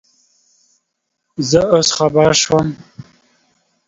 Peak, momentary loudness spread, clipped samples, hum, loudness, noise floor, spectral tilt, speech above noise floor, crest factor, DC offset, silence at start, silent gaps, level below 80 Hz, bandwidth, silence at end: 0 dBFS; 15 LU; under 0.1%; none; -14 LUFS; -73 dBFS; -4 dB/octave; 59 dB; 18 dB; under 0.1%; 1.4 s; none; -48 dBFS; 8 kHz; 0.85 s